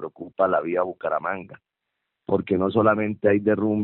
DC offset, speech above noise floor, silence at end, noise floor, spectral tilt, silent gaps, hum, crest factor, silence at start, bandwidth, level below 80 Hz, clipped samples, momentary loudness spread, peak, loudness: under 0.1%; 58 dB; 0 s; -81 dBFS; -6.5 dB/octave; none; none; 18 dB; 0 s; 4.2 kHz; -64 dBFS; under 0.1%; 11 LU; -6 dBFS; -23 LUFS